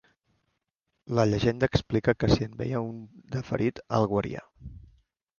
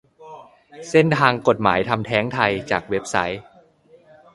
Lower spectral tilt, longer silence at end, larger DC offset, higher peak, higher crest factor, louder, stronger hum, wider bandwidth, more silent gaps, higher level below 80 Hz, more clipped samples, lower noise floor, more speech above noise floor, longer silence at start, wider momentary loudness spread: first, -7 dB/octave vs -5.5 dB/octave; second, 0.6 s vs 0.95 s; neither; second, -8 dBFS vs 0 dBFS; about the same, 22 dB vs 22 dB; second, -28 LUFS vs -20 LUFS; neither; second, 7.2 kHz vs 11.5 kHz; neither; first, -46 dBFS vs -52 dBFS; neither; first, -81 dBFS vs -53 dBFS; first, 54 dB vs 33 dB; first, 1.05 s vs 0.2 s; first, 17 LU vs 7 LU